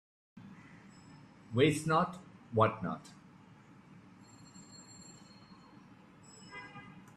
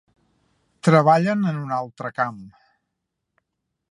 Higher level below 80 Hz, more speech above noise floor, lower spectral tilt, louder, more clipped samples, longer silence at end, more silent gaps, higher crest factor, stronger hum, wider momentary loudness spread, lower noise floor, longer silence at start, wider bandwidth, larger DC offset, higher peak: about the same, -70 dBFS vs -68 dBFS; second, 27 dB vs 59 dB; second, -6 dB/octave vs -7.5 dB/octave; second, -32 LUFS vs -20 LUFS; neither; second, 0.15 s vs 1.45 s; neither; about the same, 24 dB vs 22 dB; neither; first, 27 LU vs 12 LU; second, -58 dBFS vs -79 dBFS; second, 0.35 s vs 0.85 s; first, 13.5 kHz vs 11.5 kHz; neither; second, -14 dBFS vs -2 dBFS